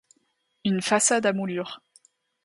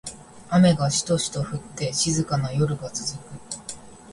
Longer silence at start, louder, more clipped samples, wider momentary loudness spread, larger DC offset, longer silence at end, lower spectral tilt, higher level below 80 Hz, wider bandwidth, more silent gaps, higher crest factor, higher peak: first, 0.65 s vs 0.05 s; about the same, -24 LUFS vs -23 LUFS; neither; second, 15 LU vs 18 LU; neither; first, 0.7 s vs 0 s; second, -3.5 dB/octave vs -5 dB/octave; second, -72 dBFS vs -52 dBFS; about the same, 11.5 kHz vs 11.5 kHz; neither; about the same, 18 dB vs 18 dB; about the same, -8 dBFS vs -8 dBFS